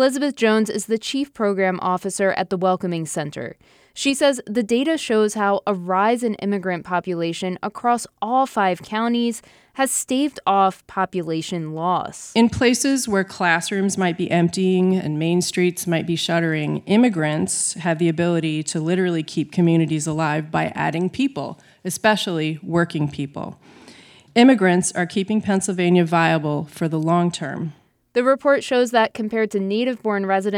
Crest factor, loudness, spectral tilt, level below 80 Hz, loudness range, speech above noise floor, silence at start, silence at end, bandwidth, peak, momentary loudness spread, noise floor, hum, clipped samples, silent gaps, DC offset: 18 dB; -20 LUFS; -5 dB/octave; -58 dBFS; 3 LU; 27 dB; 0 s; 0 s; 16 kHz; -2 dBFS; 8 LU; -47 dBFS; none; under 0.1%; none; under 0.1%